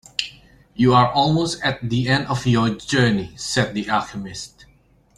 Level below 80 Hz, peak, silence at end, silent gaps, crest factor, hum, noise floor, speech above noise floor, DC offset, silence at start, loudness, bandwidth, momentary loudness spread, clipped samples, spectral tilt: -48 dBFS; -2 dBFS; 0.7 s; none; 20 dB; none; -48 dBFS; 28 dB; under 0.1%; 0.2 s; -20 LUFS; 12 kHz; 16 LU; under 0.1%; -5 dB/octave